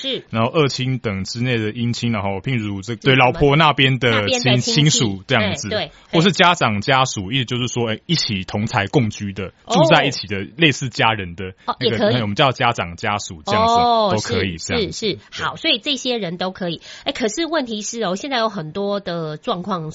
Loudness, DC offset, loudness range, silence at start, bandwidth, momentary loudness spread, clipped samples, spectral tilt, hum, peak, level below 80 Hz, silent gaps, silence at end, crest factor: -18 LUFS; under 0.1%; 6 LU; 0 s; 8 kHz; 11 LU; under 0.1%; -3.5 dB/octave; none; 0 dBFS; -48 dBFS; none; 0 s; 18 dB